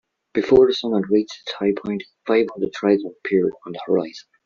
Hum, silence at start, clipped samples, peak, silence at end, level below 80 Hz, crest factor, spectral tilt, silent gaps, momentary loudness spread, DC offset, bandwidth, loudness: none; 0.35 s; under 0.1%; -4 dBFS; 0.25 s; -54 dBFS; 18 dB; -4.5 dB/octave; none; 14 LU; under 0.1%; 7 kHz; -21 LUFS